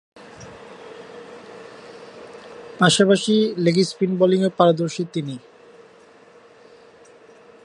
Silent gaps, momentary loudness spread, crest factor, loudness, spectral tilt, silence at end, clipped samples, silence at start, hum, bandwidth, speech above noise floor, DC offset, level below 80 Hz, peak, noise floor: none; 24 LU; 22 dB; -19 LUFS; -5 dB/octave; 2.25 s; under 0.1%; 0.4 s; none; 11 kHz; 31 dB; under 0.1%; -66 dBFS; -2 dBFS; -49 dBFS